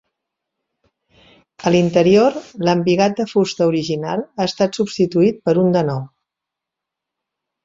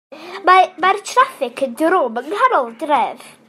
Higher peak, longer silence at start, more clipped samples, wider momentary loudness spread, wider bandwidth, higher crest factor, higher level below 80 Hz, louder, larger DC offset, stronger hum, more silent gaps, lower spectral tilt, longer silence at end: about the same, -2 dBFS vs -2 dBFS; first, 1.6 s vs 0.1 s; neither; about the same, 9 LU vs 10 LU; second, 7.8 kHz vs 14 kHz; about the same, 16 dB vs 16 dB; first, -56 dBFS vs -66 dBFS; about the same, -17 LUFS vs -16 LUFS; neither; neither; neither; first, -6.5 dB/octave vs -2.5 dB/octave; first, 1.55 s vs 0.2 s